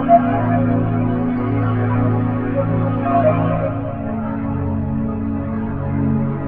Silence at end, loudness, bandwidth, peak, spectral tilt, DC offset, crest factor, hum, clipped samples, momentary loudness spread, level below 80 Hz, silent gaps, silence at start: 0 s; -19 LUFS; 3.6 kHz; 0 dBFS; -13.5 dB/octave; under 0.1%; 16 dB; none; under 0.1%; 7 LU; -36 dBFS; none; 0 s